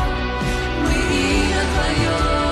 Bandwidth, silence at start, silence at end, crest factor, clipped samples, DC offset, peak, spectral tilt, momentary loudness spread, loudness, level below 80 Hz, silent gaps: 13 kHz; 0 s; 0 s; 10 dB; under 0.1%; under 0.1%; -8 dBFS; -5 dB/octave; 4 LU; -19 LUFS; -24 dBFS; none